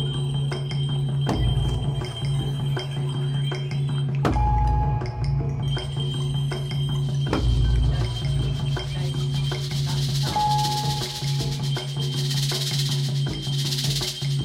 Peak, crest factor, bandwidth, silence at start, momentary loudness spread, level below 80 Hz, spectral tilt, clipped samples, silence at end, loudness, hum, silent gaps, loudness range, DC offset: -6 dBFS; 16 dB; 15.5 kHz; 0 s; 4 LU; -32 dBFS; -5.5 dB/octave; under 0.1%; 0 s; -25 LUFS; none; none; 1 LU; under 0.1%